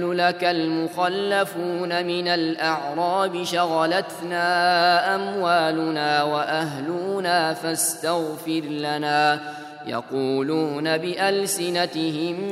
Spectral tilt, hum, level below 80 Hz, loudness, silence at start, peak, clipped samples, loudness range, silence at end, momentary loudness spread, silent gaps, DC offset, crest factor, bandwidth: -3.5 dB/octave; none; -74 dBFS; -22 LUFS; 0 s; -4 dBFS; under 0.1%; 3 LU; 0 s; 7 LU; none; under 0.1%; 18 dB; 16 kHz